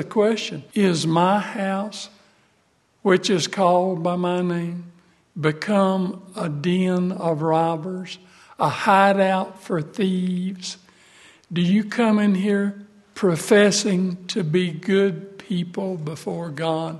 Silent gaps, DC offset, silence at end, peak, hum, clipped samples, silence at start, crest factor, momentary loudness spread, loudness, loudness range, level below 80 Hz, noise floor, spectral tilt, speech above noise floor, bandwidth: none; under 0.1%; 0 s; -2 dBFS; none; under 0.1%; 0 s; 20 dB; 13 LU; -21 LUFS; 3 LU; -68 dBFS; -63 dBFS; -5.5 dB/octave; 42 dB; 12.5 kHz